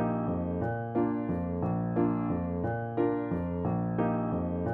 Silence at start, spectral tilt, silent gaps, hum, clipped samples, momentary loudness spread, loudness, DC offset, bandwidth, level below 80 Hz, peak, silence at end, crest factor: 0 s; -12 dB/octave; none; none; under 0.1%; 3 LU; -31 LUFS; under 0.1%; 3.5 kHz; -52 dBFS; -16 dBFS; 0 s; 14 dB